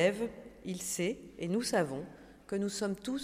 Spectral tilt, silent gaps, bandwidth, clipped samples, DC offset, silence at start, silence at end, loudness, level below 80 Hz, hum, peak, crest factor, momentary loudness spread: -4.5 dB/octave; none; 16 kHz; under 0.1%; under 0.1%; 0 s; 0 s; -35 LUFS; -64 dBFS; none; -16 dBFS; 18 dB; 13 LU